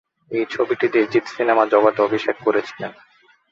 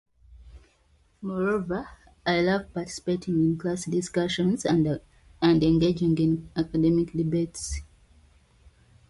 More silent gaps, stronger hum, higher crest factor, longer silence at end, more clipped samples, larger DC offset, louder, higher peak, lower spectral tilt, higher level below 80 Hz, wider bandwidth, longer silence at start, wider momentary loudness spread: neither; neither; about the same, 18 dB vs 16 dB; second, 0.6 s vs 1.25 s; neither; neither; first, -19 LUFS vs -26 LUFS; first, -2 dBFS vs -10 dBFS; about the same, -6 dB/octave vs -6 dB/octave; second, -66 dBFS vs -48 dBFS; second, 7.6 kHz vs 11.5 kHz; about the same, 0.3 s vs 0.3 s; about the same, 12 LU vs 12 LU